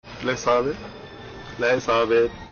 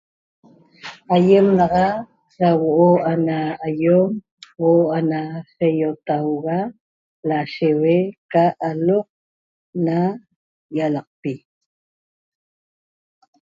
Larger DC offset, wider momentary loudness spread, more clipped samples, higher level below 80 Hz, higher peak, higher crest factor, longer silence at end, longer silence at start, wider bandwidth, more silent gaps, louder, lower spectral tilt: neither; first, 19 LU vs 15 LU; neither; first, -50 dBFS vs -58 dBFS; second, -10 dBFS vs -2 dBFS; second, 12 dB vs 18 dB; second, 0.05 s vs 2.25 s; second, 0.05 s vs 0.85 s; about the same, 7 kHz vs 7.4 kHz; second, none vs 4.31-4.37 s, 6.80-7.23 s, 8.18-8.29 s, 9.10-9.73 s, 10.36-10.69 s, 11.07-11.23 s; second, -22 LUFS vs -19 LUFS; second, -3 dB/octave vs -9 dB/octave